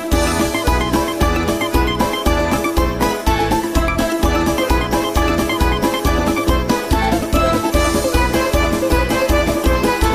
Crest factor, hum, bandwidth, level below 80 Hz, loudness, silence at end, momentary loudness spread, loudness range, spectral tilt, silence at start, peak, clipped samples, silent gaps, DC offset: 14 dB; none; 15.5 kHz; -22 dBFS; -17 LUFS; 0 s; 2 LU; 1 LU; -5 dB/octave; 0 s; -2 dBFS; under 0.1%; none; 0.3%